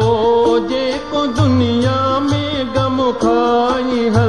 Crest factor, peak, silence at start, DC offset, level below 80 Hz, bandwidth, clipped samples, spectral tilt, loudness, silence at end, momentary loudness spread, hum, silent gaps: 12 dB; -2 dBFS; 0 s; 0.9%; -38 dBFS; 10.5 kHz; under 0.1%; -6.5 dB/octave; -15 LUFS; 0 s; 5 LU; none; none